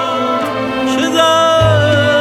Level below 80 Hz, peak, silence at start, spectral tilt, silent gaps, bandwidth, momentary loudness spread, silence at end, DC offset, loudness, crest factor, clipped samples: -38 dBFS; 0 dBFS; 0 s; -5 dB/octave; none; 15 kHz; 7 LU; 0 s; under 0.1%; -12 LUFS; 12 dB; under 0.1%